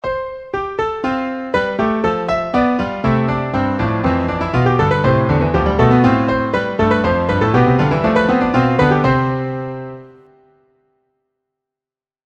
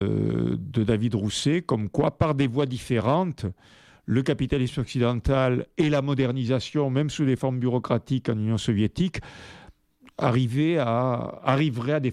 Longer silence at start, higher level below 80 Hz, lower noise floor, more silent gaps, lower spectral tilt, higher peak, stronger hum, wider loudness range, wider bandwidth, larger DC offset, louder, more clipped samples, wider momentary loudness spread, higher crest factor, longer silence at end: about the same, 0.05 s vs 0 s; first, -34 dBFS vs -46 dBFS; first, under -90 dBFS vs -54 dBFS; neither; about the same, -8 dB/octave vs -7 dB/octave; first, 0 dBFS vs -6 dBFS; neither; about the same, 4 LU vs 2 LU; second, 7.8 kHz vs 11.5 kHz; neither; first, -16 LUFS vs -25 LUFS; neither; first, 9 LU vs 5 LU; about the same, 16 dB vs 18 dB; first, 2.15 s vs 0 s